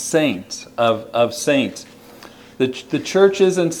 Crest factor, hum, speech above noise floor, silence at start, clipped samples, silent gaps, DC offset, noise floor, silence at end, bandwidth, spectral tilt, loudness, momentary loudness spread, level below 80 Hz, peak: 18 dB; none; 24 dB; 0 s; under 0.1%; none; under 0.1%; -42 dBFS; 0 s; 17.5 kHz; -4.5 dB/octave; -18 LUFS; 11 LU; -62 dBFS; -2 dBFS